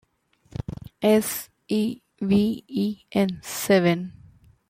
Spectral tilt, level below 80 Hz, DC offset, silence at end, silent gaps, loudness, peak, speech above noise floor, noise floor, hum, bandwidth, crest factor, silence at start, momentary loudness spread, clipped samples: -5.5 dB/octave; -54 dBFS; under 0.1%; 0.6 s; none; -24 LUFS; -6 dBFS; 37 dB; -60 dBFS; none; 16.5 kHz; 18 dB; 0.7 s; 16 LU; under 0.1%